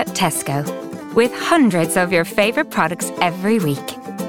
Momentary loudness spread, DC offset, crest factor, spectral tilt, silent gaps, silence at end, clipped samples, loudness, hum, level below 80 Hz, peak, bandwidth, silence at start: 9 LU; 0.2%; 18 dB; -4.5 dB/octave; none; 0 s; under 0.1%; -18 LUFS; none; -56 dBFS; 0 dBFS; 18 kHz; 0 s